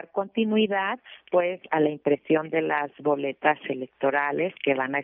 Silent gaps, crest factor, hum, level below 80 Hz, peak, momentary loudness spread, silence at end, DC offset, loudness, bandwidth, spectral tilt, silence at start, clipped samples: none; 20 dB; none; -76 dBFS; -6 dBFS; 5 LU; 0 s; under 0.1%; -25 LUFS; 3.8 kHz; -9 dB/octave; 0.15 s; under 0.1%